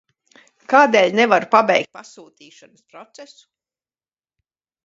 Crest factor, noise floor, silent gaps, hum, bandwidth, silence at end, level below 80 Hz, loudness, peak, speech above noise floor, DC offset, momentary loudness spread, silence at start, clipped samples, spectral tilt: 20 dB; under -90 dBFS; none; none; 7.8 kHz; 1.6 s; -74 dBFS; -15 LUFS; 0 dBFS; over 72 dB; under 0.1%; 6 LU; 0.7 s; under 0.1%; -4 dB/octave